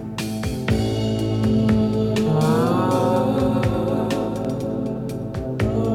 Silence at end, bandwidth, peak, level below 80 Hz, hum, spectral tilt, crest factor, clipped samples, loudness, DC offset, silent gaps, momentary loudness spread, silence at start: 0 s; 16 kHz; -8 dBFS; -38 dBFS; none; -7 dB/octave; 14 dB; under 0.1%; -21 LUFS; under 0.1%; none; 8 LU; 0 s